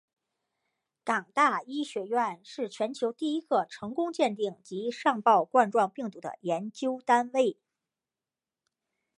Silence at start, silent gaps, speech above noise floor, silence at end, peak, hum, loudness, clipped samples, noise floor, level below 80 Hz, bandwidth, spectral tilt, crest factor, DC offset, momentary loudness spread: 1.05 s; none; over 62 dB; 1.65 s; -8 dBFS; none; -29 LUFS; under 0.1%; under -90 dBFS; -84 dBFS; 11.5 kHz; -4.5 dB/octave; 22 dB; under 0.1%; 11 LU